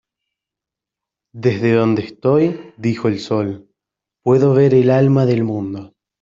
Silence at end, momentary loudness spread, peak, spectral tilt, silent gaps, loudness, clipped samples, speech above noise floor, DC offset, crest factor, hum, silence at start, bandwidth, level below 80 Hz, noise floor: 0.35 s; 12 LU; -2 dBFS; -8.5 dB/octave; none; -16 LUFS; under 0.1%; 71 dB; under 0.1%; 14 dB; none; 1.35 s; 7.4 kHz; -58 dBFS; -86 dBFS